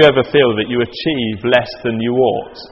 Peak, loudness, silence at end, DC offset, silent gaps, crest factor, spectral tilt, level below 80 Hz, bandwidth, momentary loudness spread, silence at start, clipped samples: 0 dBFS; -16 LUFS; 0.05 s; under 0.1%; none; 14 dB; -7.5 dB/octave; -46 dBFS; 8 kHz; 6 LU; 0 s; under 0.1%